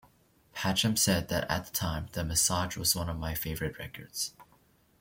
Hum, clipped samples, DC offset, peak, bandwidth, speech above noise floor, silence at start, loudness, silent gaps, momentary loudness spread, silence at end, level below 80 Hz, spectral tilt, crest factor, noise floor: none; under 0.1%; under 0.1%; -12 dBFS; 17 kHz; 34 dB; 0.55 s; -30 LUFS; none; 10 LU; 0.6 s; -50 dBFS; -3 dB/octave; 20 dB; -65 dBFS